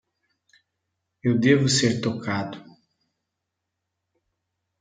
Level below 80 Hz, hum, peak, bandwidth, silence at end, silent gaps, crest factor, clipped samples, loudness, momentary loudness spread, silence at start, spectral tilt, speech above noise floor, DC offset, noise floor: -66 dBFS; none; -6 dBFS; 9.6 kHz; 2.2 s; none; 20 dB; under 0.1%; -22 LUFS; 13 LU; 1.25 s; -5 dB/octave; 61 dB; under 0.1%; -82 dBFS